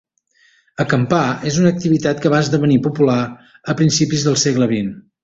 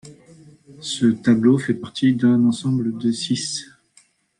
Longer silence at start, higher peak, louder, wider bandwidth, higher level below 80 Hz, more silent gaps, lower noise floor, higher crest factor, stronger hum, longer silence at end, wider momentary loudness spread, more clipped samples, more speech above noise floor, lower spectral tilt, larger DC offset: first, 0.8 s vs 0.05 s; about the same, -2 dBFS vs -4 dBFS; first, -16 LUFS vs -20 LUFS; second, 8 kHz vs 11 kHz; first, -50 dBFS vs -62 dBFS; neither; about the same, -57 dBFS vs -57 dBFS; about the same, 16 dB vs 16 dB; neither; second, 0.25 s vs 0.75 s; about the same, 9 LU vs 11 LU; neither; about the same, 41 dB vs 39 dB; about the same, -5.5 dB/octave vs -5.5 dB/octave; neither